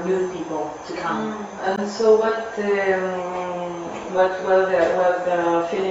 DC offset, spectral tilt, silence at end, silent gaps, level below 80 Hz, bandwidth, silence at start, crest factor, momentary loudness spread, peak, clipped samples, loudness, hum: under 0.1%; -5.5 dB/octave; 0 s; none; -60 dBFS; 8 kHz; 0 s; 18 dB; 11 LU; -4 dBFS; under 0.1%; -22 LUFS; none